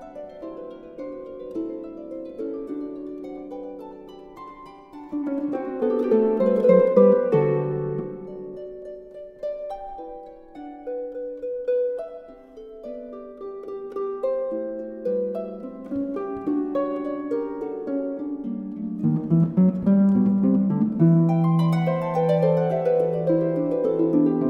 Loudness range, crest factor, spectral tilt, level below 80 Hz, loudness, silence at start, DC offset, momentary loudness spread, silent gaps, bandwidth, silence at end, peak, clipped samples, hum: 14 LU; 20 dB; -10.5 dB/octave; -58 dBFS; -23 LUFS; 0 s; under 0.1%; 20 LU; none; 5.6 kHz; 0 s; -4 dBFS; under 0.1%; none